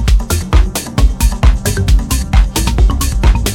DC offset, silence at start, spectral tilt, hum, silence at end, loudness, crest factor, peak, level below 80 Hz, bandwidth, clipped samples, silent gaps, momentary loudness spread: under 0.1%; 0 s; -4.5 dB/octave; none; 0 s; -14 LUFS; 10 dB; 0 dBFS; -12 dBFS; 17 kHz; under 0.1%; none; 2 LU